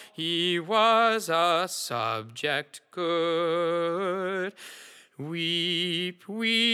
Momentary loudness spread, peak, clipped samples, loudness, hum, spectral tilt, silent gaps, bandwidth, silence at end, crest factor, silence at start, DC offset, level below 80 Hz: 13 LU; -10 dBFS; under 0.1%; -26 LUFS; none; -3.5 dB/octave; none; 17 kHz; 0 s; 18 dB; 0 s; under 0.1%; under -90 dBFS